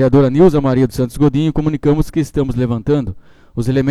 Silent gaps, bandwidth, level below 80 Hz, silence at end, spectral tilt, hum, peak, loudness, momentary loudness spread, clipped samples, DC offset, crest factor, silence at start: none; 13.5 kHz; -30 dBFS; 0 s; -8.5 dB/octave; none; 0 dBFS; -15 LUFS; 7 LU; under 0.1%; under 0.1%; 14 dB; 0 s